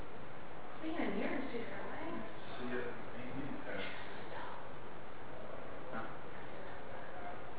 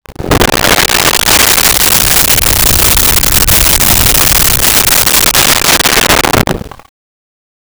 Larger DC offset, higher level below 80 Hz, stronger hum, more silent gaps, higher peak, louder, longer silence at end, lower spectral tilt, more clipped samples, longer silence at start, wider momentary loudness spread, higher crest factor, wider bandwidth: first, 2% vs under 0.1%; second, -66 dBFS vs -20 dBFS; neither; neither; second, -24 dBFS vs 0 dBFS; second, -45 LUFS vs -5 LUFS; second, 0 s vs 1.05 s; first, -4 dB/octave vs -1.5 dB/octave; neither; about the same, 0 s vs 0.1 s; first, 11 LU vs 4 LU; first, 18 dB vs 8 dB; second, 4 kHz vs over 20 kHz